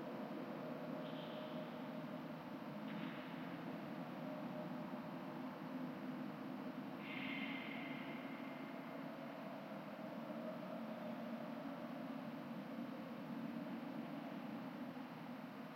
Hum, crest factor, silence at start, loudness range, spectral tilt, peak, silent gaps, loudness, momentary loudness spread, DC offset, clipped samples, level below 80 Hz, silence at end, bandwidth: none; 14 dB; 0 s; 2 LU; -7 dB/octave; -34 dBFS; none; -49 LUFS; 3 LU; under 0.1%; under 0.1%; under -90 dBFS; 0 s; 16.5 kHz